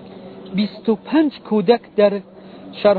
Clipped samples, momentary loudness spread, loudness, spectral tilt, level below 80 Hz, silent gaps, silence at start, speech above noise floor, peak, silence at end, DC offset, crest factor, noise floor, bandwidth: under 0.1%; 20 LU; -19 LUFS; -10 dB/octave; -62 dBFS; none; 0 s; 19 dB; -2 dBFS; 0 s; under 0.1%; 18 dB; -37 dBFS; 4.8 kHz